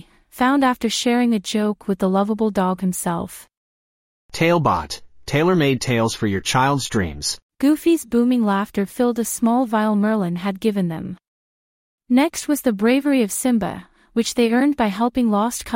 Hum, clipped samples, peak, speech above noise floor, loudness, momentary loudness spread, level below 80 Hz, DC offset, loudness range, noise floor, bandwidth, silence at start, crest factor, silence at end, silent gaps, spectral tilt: none; under 0.1%; -4 dBFS; over 71 dB; -19 LUFS; 8 LU; -50 dBFS; under 0.1%; 3 LU; under -90 dBFS; 16.5 kHz; 0.35 s; 16 dB; 0 s; 3.57-4.29 s, 7.42-7.49 s, 11.28-11.98 s; -5 dB/octave